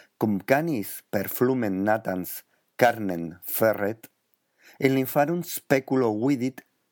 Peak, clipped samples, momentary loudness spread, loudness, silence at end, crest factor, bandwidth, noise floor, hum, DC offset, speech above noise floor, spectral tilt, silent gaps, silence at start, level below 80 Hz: -4 dBFS; under 0.1%; 9 LU; -25 LUFS; 0.3 s; 22 dB; 19 kHz; -69 dBFS; none; under 0.1%; 44 dB; -6 dB/octave; none; 0.2 s; -72 dBFS